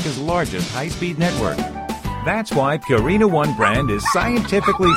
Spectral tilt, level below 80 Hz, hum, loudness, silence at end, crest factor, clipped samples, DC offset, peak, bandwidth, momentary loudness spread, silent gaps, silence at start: -5.5 dB/octave; -36 dBFS; none; -19 LUFS; 0 s; 16 dB; under 0.1%; under 0.1%; -2 dBFS; 16.5 kHz; 8 LU; none; 0 s